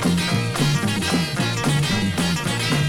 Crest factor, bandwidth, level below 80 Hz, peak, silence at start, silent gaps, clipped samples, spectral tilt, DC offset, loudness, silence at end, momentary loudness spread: 12 dB; 17 kHz; -44 dBFS; -8 dBFS; 0 s; none; under 0.1%; -4.5 dB/octave; under 0.1%; -21 LUFS; 0 s; 2 LU